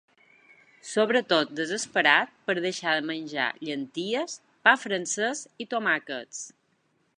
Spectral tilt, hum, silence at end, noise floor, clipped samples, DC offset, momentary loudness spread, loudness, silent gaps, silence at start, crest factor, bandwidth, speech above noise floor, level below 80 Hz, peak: -2.5 dB/octave; none; 0.7 s; -70 dBFS; under 0.1%; under 0.1%; 14 LU; -26 LUFS; none; 0.85 s; 24 dB; 11.5 kHz; 43 dB; -82 dBFS; -4 dBFS